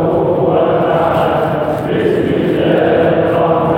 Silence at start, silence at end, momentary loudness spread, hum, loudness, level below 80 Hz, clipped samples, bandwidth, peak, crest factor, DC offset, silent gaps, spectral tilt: 0 s; 0 s; 3 LU; none; -13 LUFS; -40 dBFS; under 0.1%; 16.5 kHz; -2 dBFS; 12 dB; under 0.1%; none; -8.5 dB/octave